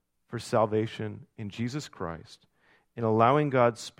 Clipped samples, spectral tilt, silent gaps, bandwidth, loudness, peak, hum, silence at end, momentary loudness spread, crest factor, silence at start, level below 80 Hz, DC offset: under 0.1%; -6.5 dB/octave; none; 15 kHz; -28 LUFS; -8 dBFS; none; 0.1 s; 18 LU; 22 dB; 0.3 s; -64 dBFS; under 0.1%